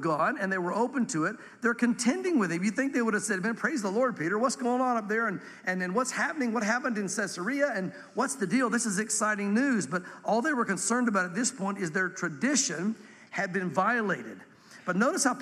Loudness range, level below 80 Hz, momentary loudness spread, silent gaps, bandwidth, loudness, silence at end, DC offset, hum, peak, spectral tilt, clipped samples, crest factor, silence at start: 2 LU; -82 dBFS; 6 LU; none; 14 kHz; -29 LUFS; 0 s; under 0.1%; none; -12 dBFS; -4 dB/octave; under 0.1%; 16 dB; 0 s